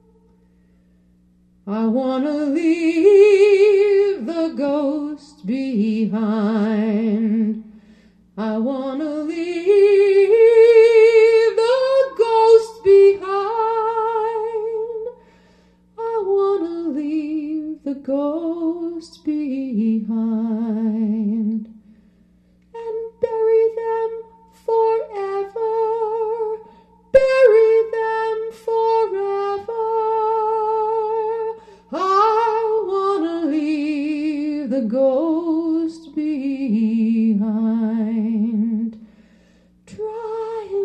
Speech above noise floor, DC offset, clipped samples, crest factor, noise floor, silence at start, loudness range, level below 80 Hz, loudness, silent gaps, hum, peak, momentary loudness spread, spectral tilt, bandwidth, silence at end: 40 dB; under 0.1%; under 0.1%; 18 dB; -55 dBFS; 1.65 s; 10 LU; -60 dBFS; -18 LUFS; none; 60 Hz at -55 dBFS; 0 dBFS; 14 LU; -7 dB/octave; 8.8 kHz; 0 s